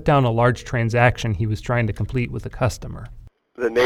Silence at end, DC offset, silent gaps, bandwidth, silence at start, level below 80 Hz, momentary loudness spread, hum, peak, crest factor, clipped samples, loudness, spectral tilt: 0 s; under 0.1%; none; 12 kHz; 0 s; -38 dBFS; 15 LU; none; -2 dBFS; 18 dB; under 0.1%; -21 LUFS; -6.5 dB/octave